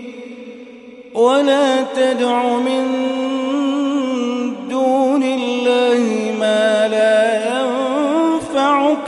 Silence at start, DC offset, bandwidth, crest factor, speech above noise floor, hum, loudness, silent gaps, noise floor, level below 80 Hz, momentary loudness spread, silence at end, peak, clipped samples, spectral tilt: 0 s; under 0.1%; 11.5 kHz; 14 dB; 22 dB; none; -16 LUFS; none; -37 dBFS; -64 dBFS; 8 LU; 0 s; -2 dBFS; under 0.1%; -4 dB/octave